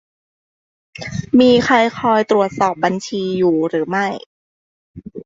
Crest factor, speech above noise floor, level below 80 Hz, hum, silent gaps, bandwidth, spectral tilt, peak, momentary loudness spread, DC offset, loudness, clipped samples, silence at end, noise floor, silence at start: 16 dB; over 75 dB; -52 dBFS; none; 4.26-4.94 s; 7.8 kHz; -5.5 dB/octave; -2 dBFS; 15 LU; under 0.1%; -16 LUFS; under 0.1%; 0.05 s; under -90 dBFS; 1 s